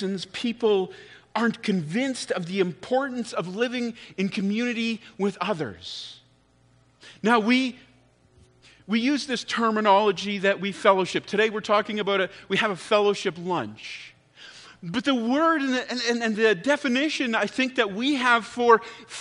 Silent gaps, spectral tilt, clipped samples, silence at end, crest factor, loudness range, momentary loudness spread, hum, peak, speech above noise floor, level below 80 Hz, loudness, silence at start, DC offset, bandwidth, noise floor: none; -4.5 dB/octave; under 0.1%; 0 s; 22 dB; 5 LU; 11 LU; none; -4 dBFS; 36 dB; -68 dBFS; -24 LUFS; 0 s; under 0.1%; 10.5 kHz; -61 dBFS